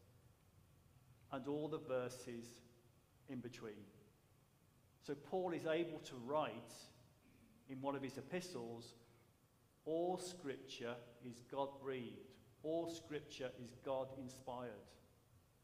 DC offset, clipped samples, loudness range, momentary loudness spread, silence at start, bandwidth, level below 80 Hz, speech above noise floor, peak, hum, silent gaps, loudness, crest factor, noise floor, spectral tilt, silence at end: under 0.1%; under 0.1%; 5 LU; 17 LU; 0 s; 15.5 kHz; -82 dBFS; 27 dB; -28 dBFS; none; none; -47 LUFS; 20 dB; -74 dBFS; -5.5 dB/octave; 0.25 s